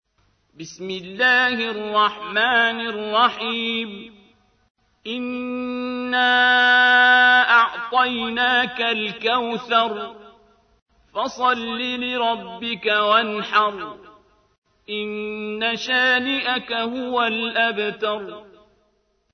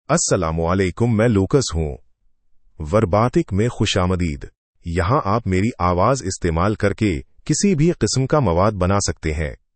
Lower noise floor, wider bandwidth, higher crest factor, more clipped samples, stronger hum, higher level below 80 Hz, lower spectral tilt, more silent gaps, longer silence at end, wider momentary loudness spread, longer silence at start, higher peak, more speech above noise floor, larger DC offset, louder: first, -66 dBFS vs -56 dBFS; second, 6.6 kHz vs 8.8 kHz; about the same, 18 dB vs 16 dB; neither; neither; second, -64 dBFS vs -38 dBFS; second, -3.5 dB/octave vs -5.5 dB/octave; about the same, 4.70-4.75 s, 10.82-10.86 s, 14.58-14.62 s vs 4.58-4.74 s; first, 0.9 s vs 0.2 s; first, 17 LU vs 9 LU; first, 0.6 s vs 0.1 s; about the same, -4 dBFS vs -2 dBFS; first, 45 dB vs 37 dB; neither; about the same, -19 LUFS vs -19 LUFS